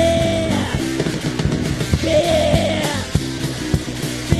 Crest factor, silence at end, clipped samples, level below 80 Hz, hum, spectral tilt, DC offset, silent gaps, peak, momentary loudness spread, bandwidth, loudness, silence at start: 18 dB; 0 s; under 0.1%; -30 dBFS; none; -5 dB/octave; 0.4%; none; 0 dBFS; 6 LU; 13 kHz; -19 LUFS; 0 s